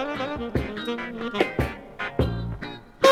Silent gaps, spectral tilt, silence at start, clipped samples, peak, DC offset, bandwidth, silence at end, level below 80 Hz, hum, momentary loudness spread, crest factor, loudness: none; -5.5 dB/octave; 0 s; under 0.1%; -4 dBFS; under 0.1%; 16 kHz; 0 s; -38 dBFS; none; 8 LU; 22 dB; -28 LUFS